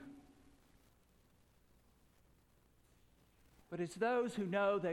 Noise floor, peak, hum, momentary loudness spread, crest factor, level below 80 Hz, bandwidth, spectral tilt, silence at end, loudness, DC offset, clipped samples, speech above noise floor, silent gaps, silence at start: -71 dBFS; -24 dBFS; none; 14 LU; 20 dB; -74 dBFS; 17 kHz; -6 dB/octave; 0 s; -38 LUFS; under 0.1%; under 0.1%; 34 dB; none; 0 s